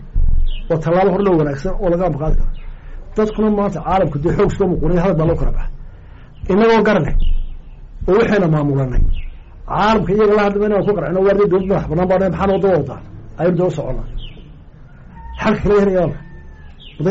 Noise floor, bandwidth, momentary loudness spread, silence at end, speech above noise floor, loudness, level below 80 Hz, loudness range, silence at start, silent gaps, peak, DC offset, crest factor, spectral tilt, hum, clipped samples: -38 dBFS; 7.6 kHz; 16 LU; 0 s; 24 dB; -16 LUFS; -22 dBFS; 4 LU; 0 s; none; -6 dBFS; 0.2%; 10 dB; -6.5 dB/octave; none; under 0.1%